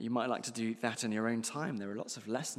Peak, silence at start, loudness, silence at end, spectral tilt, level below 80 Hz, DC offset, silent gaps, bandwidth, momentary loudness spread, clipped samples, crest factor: -16 dBFS; 0 s; -36 LUFS; 0 s; -4 dB/octave; -86 dBFS; under 0.1%; none; 15 kHz; 6 LU; under 0.1%; 20 dB